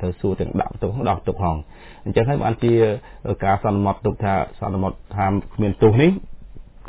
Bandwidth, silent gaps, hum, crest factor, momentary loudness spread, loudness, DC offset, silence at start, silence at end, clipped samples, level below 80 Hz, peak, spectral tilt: 4 kHz; none; none; 18 dB; 8 LU; -21 LUFS; under 0.1%; 0 s; 0 s; under 0.1%; -36 dBFS; -2 dBFS; -12 dB/octave